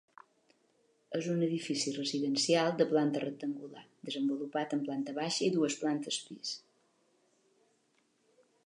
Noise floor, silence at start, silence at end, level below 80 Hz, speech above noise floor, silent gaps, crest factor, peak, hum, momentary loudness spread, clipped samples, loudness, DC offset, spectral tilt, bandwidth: -74 dBFS; 1.1 s; 2.05 s; -86 dBFS; 41 dB; none; 20 dB; -14 dBFS; none; 12 LU; under 0.1%; -33 LUFS; under 0.1%; -4.5 dB/octave; 11 kHz